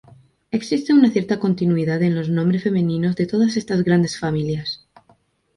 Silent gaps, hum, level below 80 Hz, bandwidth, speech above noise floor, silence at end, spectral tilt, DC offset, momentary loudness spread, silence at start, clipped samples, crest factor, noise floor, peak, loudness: none; none; -54 dBFS; 11 kHz; 40 dB; 0.8 s; -7 dB/octave; under 0.1%; 10 LU; 0.55 s; under 0.1%; 16 dB; -59 dBFS; -4 dBFS; -19 LUFS